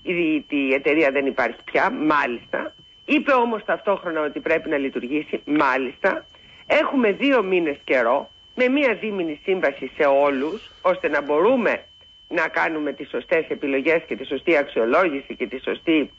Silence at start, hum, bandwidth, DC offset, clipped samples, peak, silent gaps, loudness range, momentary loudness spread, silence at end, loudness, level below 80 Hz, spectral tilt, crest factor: 0.05 s; none; 7.8 kHz; under 0.1%; under 0.1%; -8 dBFS; none; 2 LU; 9 LU; 0.1 s; -21 LUFS; -60 dBFS; -6 dB/octave; 14 dB